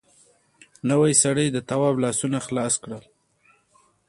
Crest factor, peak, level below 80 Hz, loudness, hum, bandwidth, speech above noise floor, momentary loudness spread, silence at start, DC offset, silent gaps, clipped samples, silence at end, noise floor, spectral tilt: 20 dB; -4 dBFS; -62 dBFS; -22 LUFS; none; 11.5 kHz; 40 dB; 11 LU; 0.85 s; under 0.1%; none; under 0.1%; 1.1 s; -62 dBFS; -4.5 dB/octave